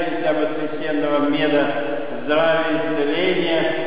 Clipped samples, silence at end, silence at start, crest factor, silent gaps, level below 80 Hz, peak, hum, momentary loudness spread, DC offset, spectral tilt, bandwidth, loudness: under 0.1%; 0 s; 0 s; 14 dB; none; -60 dBFS; -8 dBFS; none; 6 LU; 4%; -10 dB/octave; 5.2 kHz; -20 LUFS